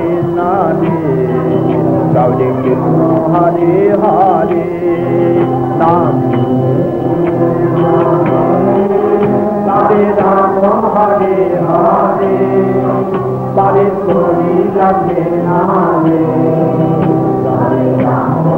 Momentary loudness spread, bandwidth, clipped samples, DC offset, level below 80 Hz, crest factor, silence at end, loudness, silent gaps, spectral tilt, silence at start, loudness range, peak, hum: 3 LU; 4.6 kHz; under 0.1%; under 0.1%; -42 dBFS; 10 dB; 0 s; -11 LUFS; none; -10.5 dB/octave; 0 s; 1 LU; 0 dBFS; none